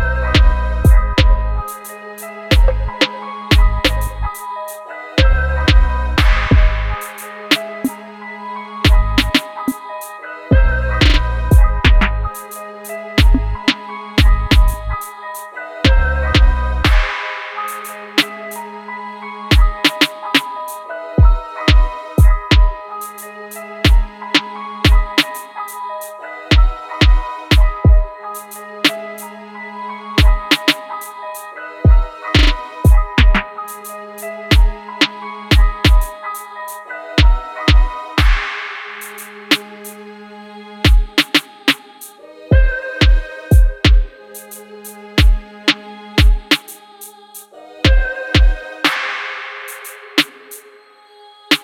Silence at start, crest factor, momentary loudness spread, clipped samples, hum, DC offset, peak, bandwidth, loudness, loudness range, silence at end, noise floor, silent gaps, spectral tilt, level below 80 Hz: 0 s; 14 dB; 16 LU; under 0.1%; none; under 0.1%; 0 dBFS; 16 kHz; -16 LUFS; 3 LU; 0.05 s; -45 dBFS; none; -5 dB/octave; -16 dBFS